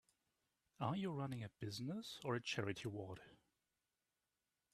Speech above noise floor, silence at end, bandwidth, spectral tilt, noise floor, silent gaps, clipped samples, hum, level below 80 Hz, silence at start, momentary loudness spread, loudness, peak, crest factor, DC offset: over 44 dB; 1.4 s; 13.5 kHz; -5.5 dB/octave; under -90 dBFS; none; under 0.1%; none; -80 dBFS; 0.8 s; 7 LU; -46 LUFS; -26 dBFS; 22 dB; under 0.1%